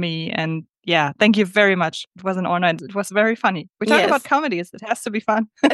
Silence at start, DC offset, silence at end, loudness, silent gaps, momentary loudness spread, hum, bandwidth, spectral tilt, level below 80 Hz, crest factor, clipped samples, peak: 0 s; under 0.1%; 0 s; -19 LUFS; 2.07-2.11 s; 10 LU; none; 12.5 kHz; -5 dB/octave; -70 dBFS; 18 dB; under 0.1%; -2 dBFS